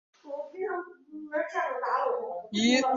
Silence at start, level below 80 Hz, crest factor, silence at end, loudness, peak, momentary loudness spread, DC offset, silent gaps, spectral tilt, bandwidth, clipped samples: 0.25 s; -72 dBFS; 20 dB; 0 s; -30 LUFS; -10 dBFS; 15 LU; under 0.1%; none; -3.5 dB/octave; 7.6 kHz; under 0.1%